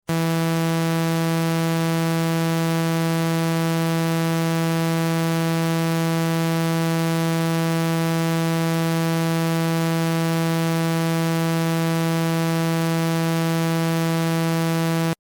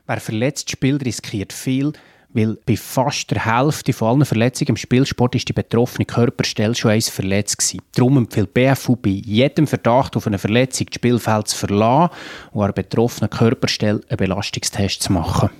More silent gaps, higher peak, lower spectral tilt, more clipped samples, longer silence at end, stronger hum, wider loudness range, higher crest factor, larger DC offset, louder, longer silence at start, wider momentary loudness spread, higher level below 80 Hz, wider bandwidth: neither; second, -14 dBFS vs 0 dBFS; about the same, -6 dB/octave vs -5 dB/octave; neither; about the same, 0.05 s vs 0.1 s; neither; second, 0 LU vs 3 LU; second, 6 dB vs 18 dB; neither; second, -21 LUFS vs -18 LUFS; about the same, 0.1 s vs 0.1 s; second, 0 LU vs 5 LU; second, -62 dBFS vs -48 dBFS; about the same, 17.5 kHz vs 16 kHz